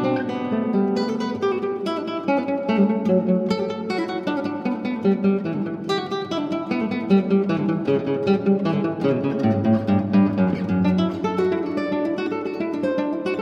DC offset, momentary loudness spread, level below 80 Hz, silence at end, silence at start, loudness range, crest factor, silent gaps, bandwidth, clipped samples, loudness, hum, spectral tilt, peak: under 0.1%; 6 LU; -60 dBFS; 0 s; 0 s; 3 LU; 16 dB; none; 8 kHz; under 0.1%; -22 LUFS; none; -8 dB/octave; -6 dBFS